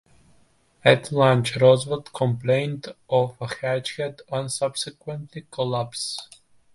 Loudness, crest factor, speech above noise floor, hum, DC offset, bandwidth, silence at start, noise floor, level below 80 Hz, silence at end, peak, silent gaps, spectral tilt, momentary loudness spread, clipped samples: -23 LUFS; 22 dB; 37 dB; none; under 0.1%; 11.5 kHz; 0.85 s; -59 dBFS; -60 dBFS; 0.5 s; -2 dBFS; none; -5 dB/octave; 15 LU; under 0.1%